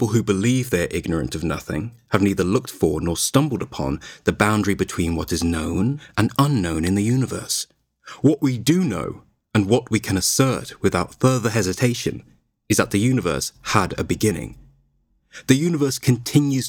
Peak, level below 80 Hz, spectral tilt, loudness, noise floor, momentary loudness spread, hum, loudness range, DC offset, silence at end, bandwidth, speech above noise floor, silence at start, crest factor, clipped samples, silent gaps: 0 dBFS; -42 dBFS; -5 dB/octave; -21 LUFS; -64 dBFS; 8 LU; none; 2 LU; under 0.1%; 0 s; 18.5 kHz; 44 dB; 0 s; 20 dB; under 0.1%; none